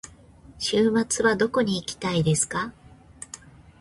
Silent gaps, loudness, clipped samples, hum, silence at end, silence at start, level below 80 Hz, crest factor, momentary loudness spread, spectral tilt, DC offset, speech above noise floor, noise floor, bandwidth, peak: none; -24 LUFS; under 0.1%; none; 0.45 s; 0.05 s; -54 dBFS; 16 dB; 19 LU; -4 dB/octave; under 0.1%; 27 dB; -50 dBFS; 11.5 kHz; -10 dBFS